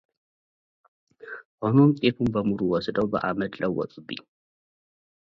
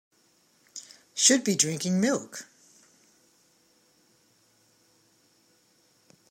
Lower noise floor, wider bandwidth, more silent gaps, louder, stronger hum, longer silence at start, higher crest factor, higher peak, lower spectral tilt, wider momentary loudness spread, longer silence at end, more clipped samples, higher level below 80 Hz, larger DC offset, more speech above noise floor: first, under -90 dBFS vs -66 dBFS; second, 6.2 kHz vs 16 kHz; first, 1.45-1.58 s vs none; about the same, -24 LUFS vs -24 LUFS; neither; first, 1.25 s vs 0.75 s; second, 20 dB vs 26 dB; about the same, -8 dBFS vs -6 dBFS; first, -9 dB/octave vs -2.5 dB/octave; second, 19 LU vs 23 LU; second, 1 s vs 3.85 s; neither; first, -58 dBFS vs -80 dBFS; neither; first, over 66 dB vs 41 dB